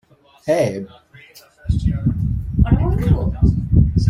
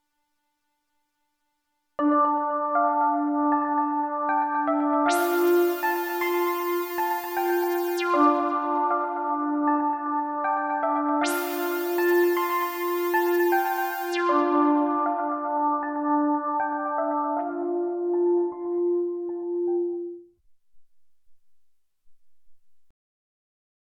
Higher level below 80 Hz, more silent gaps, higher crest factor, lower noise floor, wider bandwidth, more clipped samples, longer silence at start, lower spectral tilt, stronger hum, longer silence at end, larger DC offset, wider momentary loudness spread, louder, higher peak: first, -24 dBFS vs -78 dBFS; neither; about the same, 16 dB vs 18 dB; second, -45 dBFS vs -76 dBFS; second, 12 kHz vs 17.5 kHz; neither; second, 0.45 s vs 2 s; first, -8.5 dB/octave vs -3 dB/octave; neither; second, 0 s vs 1.2 s; neither; first, 14 LU vs 6 LU; first, -19 LUFS vs -25 LUFS; first, -2 dBFS vs -8 dBFS